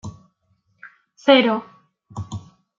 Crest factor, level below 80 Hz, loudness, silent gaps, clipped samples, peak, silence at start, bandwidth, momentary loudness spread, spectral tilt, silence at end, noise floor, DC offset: 22 dB; -60 dBFS; -17 LUFS; none; under 0.1%; -2 dBFS; 0.05 s; 7.6 kHz; 23 LU; -5.5 dB/octave; 0.4 s; -66 dBFS; under 0.1%